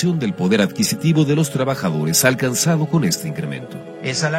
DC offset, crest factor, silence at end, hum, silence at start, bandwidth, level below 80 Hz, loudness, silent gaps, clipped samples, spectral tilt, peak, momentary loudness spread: under 0.1%; 18 dB; 0 s; none; 0 s; 16.5 kHz; -56 dBFS; -18 LUFS; none; under 0.1%; -4.5 dB/octave; 0 dBFS; 12 LU